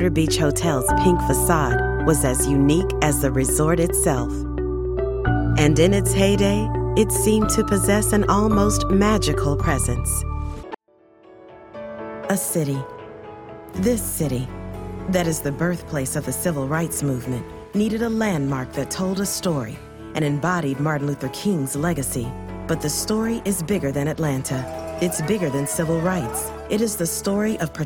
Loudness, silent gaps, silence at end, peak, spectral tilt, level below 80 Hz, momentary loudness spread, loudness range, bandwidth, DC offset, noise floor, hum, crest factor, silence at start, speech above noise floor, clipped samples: -21 LUFS; none; 0 s; -4 dBFS; -5 dB/octave; -32 dBFS; 12 LU; 7 LU; 19 kHz; under 0.1%; -54 dBFS; none; 16 dB; 0 s; 34 dB; under 0.1%